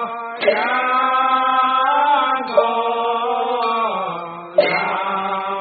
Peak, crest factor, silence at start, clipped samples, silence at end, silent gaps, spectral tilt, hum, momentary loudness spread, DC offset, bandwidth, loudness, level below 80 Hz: -2 dBFS; 16 dB; 0 s; under 0.1%; 0 s; none; -0.5 dB/octave; none; 6 LU; under 0.1%; 4.8 kHz; -18 LUFS; -72 dBFS